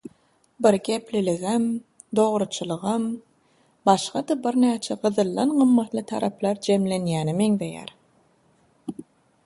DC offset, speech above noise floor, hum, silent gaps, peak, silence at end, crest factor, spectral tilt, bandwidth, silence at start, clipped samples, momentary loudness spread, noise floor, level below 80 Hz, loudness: under 0.1%; 40 dB; none; none; -2 dBFS; 0.45 s; 22 dB; -6 dB/octave; 11.5 kHz; 0.6 s; under 0.1%; 14 LU; -62 dBFS; -66 dBFS; -23 LUFS